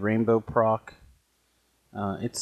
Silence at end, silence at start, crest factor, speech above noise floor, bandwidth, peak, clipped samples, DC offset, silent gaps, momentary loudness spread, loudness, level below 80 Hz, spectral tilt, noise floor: 0 s; 0 s; 20 dB; 44 dB; 12.5 kHz; -8 dBFS; under 0.1%; under 0.1%; none; 10 LU; -26 LUFS; -58 dBFS; -6 dB/octave; -69 dBFS